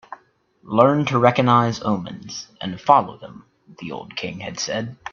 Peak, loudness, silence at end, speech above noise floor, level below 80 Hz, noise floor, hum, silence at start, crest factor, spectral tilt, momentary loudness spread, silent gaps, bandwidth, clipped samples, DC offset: 0 dBFS; -20 LUFS; 0.05 s; 37 dB; -60 dBFS; -58 dBFS; none; 0.1 s; 20 dB; -5.5 dB/octave; 17 LU; none; 7.4 kHz; under 0.1%; under 0.1%